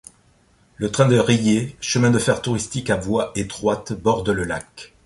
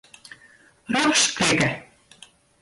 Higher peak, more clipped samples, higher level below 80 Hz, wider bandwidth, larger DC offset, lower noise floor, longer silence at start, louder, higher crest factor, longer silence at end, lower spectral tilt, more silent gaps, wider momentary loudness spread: first, -2 dBFS vs -8 dBFS; neither; first, -46 dBFS vs -56 dBFS; about the same, 11.5 kHz vs 11.5 kHz; neither; about the same, -57 dBFS vs -54 dBFS; about the same, 0.8 s vs 0.9 s; about the same, -20 LUFS vs -20 LUFS; about the same, 18 dB vs 18 dB; second, 0.2 s vs 0.8 s; first, -5 dB/octave vs -2.5 dB/octave; neither; about the same, 9 LU vs 8 LU